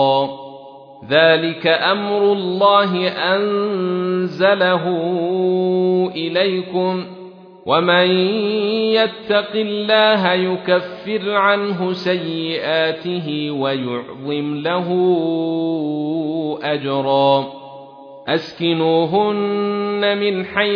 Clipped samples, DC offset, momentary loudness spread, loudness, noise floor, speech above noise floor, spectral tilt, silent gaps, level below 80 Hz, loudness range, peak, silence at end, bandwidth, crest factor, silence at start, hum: under 0.1%; under 0.1%; 9 LU; -17 LUFS; -38 dBFS; 21 dB; -7.5 dB/octave; none; -66 dBFS; 4 LU; 0 dBFS; 0 s; 5.4 kHz; 18 dB; 0 s; none